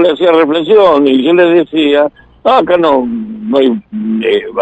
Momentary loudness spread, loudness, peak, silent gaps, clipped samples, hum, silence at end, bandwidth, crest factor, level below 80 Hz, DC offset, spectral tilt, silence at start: 9 LU; -10 LUFS; 0 dBFS; none; under 0.1%; none; 0 s; 8.2 kHz; 10 dB; -48 dBFS; under 0.1%; -7 dB/octave; 0 s